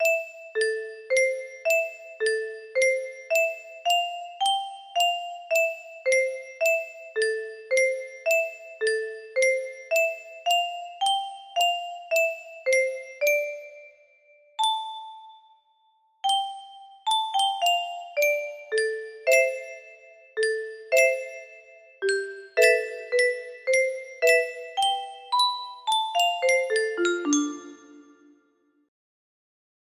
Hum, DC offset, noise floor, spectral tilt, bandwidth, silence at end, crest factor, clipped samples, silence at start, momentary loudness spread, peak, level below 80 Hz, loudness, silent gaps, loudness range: none; under 0.1%; -67 dBFS; 0.5 dB/octave; 15.5 kHz; 1.85 s; 22 dB; under 0.1%; 0 s; 11 LU; -4 dBFS; -78 dBFS; -25 LUFS; none; 4 LU